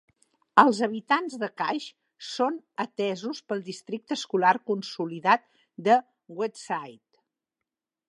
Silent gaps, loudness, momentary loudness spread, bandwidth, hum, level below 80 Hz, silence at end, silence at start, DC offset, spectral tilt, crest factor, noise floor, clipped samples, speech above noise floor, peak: none; -26 LUFS; 13 LU; 11.5 kHz; none; -80 dBFS; 1.15 s; 0.55 s; under 0.1%; -4.5 dB/octave; 26 dB; -88 dBFS; under 0.1%; 62 dB; -2 dBFS